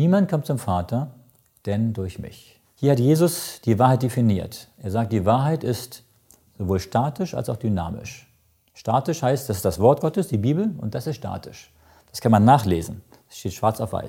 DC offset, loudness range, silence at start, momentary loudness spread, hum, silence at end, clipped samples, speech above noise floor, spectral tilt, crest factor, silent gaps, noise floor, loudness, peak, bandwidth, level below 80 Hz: under 0.1%; 4 LU; 0 s; 17 LU; none; 0 s; under 0.1%; 40 dB; -7 dB/octave; 20 dB; none; -61 dBFS; -22 LUFS; -2 dBFS; 17 kHz; -50 dBFS